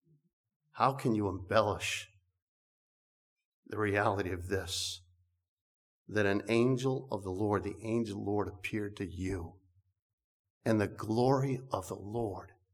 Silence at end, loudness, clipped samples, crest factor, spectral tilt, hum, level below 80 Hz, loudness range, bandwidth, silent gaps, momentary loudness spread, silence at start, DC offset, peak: 0.25 s; -34 LUFS; under 0.1%; 24 dB; -5.5 dB/octave; none; -62 dBFS; 3 LU; 17 kHz; 2.42-3.36 s, 3.45-3.63 s, 5.48-6.05 s, 10.02-10.18 s, 10.24-10.44 s, 10.50-10.61 s; 10 LU; 0.75 s; under 0.1%; -12 dBFS